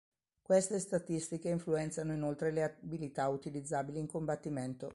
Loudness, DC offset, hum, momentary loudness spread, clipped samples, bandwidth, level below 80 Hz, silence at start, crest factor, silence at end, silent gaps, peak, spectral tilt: -37 LUFS; under 0.1%; none; 8 LU; under 0.1%; 11.5 kHz; -68 dBFS; 0.5 s; 18 dB; 0 s; none; -18 dBFS; -6 dB/octave